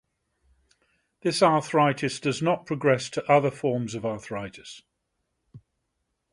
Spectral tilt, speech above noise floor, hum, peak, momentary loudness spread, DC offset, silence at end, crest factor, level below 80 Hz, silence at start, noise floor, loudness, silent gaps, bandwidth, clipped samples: -5.5 dB/octave; 54 dB; none; -6 dBFS; 14 LU; under 0.1%; 0.75 s; 20 dB; -64 dBFS; 1.25 s; -78 dBFS; -25 LUFS; none; 11.5 kHz; under 0.1%